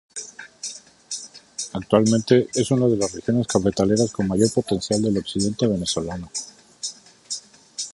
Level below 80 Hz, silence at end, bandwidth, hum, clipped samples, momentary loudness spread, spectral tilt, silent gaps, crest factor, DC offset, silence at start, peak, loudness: -50 dBFS; 0.05 s; 11.5 kHz; none; under 0.1%; 15 LU; -5 dB/octave; none; 20 dB; under 0.1%; 0.15 s; -2 dBFS; -22 LUFS